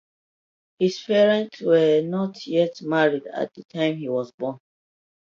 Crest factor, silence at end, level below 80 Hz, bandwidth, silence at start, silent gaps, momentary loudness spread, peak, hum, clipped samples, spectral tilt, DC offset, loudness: 18 dB; 0.75 s; -74 dBFS; 7.4 kHz; 0.8 s; 4.34-4.38 s; 12 LU; -6 dBFS; none; under 0.1%; -6.5 dB/octave; under 0.1%; -23 LUFS